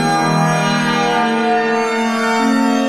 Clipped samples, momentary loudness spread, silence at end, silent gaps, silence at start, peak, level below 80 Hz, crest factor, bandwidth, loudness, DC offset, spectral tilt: under 0.1%; 2 LU; 0 s; none; 0 s; -4 dBFS; -60 dBFS; 12 dB; 14.5 kHz; -15 LUFS; under 0.1%; -5 dB/octave